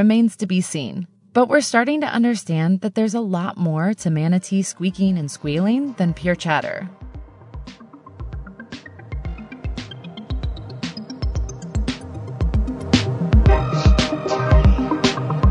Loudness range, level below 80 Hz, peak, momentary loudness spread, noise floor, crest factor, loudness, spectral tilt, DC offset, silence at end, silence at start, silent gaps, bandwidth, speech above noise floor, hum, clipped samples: 14 LU; -26 dBFS; -2 dBFS; 19 LU; -42 dBFS; 18 dB; -20 LUFS; -6 dB/octave; under 0.1%; 0 s; 0 s; none; 11 kHz; 23 dB; none; under 0.1%